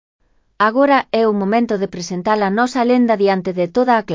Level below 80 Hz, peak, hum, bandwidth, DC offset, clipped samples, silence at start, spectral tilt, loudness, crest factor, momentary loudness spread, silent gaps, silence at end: -58 dBFS; -2 dBFS; none; 7.6 kHz; under 0.1%; under 0.1%; 0.6 s; -6 dB/octave; -16 LUFS; 14 dB; 6 LU; none; 0 s